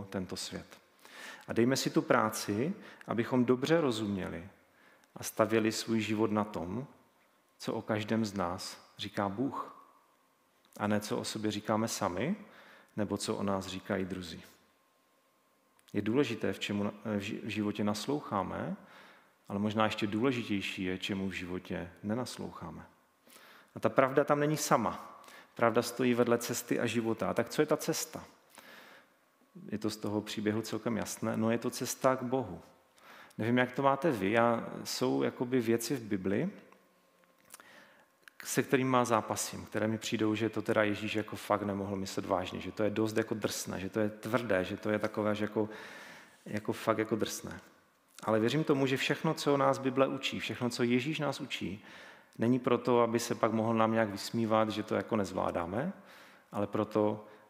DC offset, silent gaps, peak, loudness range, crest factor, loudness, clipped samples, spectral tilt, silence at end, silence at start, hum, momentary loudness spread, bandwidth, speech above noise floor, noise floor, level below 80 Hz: under 0.1%; none; -8 dBFS; 6 LU; 24 dB; -33 LUFS; under 0.1%; -5 dB/octave; 0.1 s; 0 s; none; 14 LU; 16 kHz; 38 dB; -71 dBFS; -72 dBFS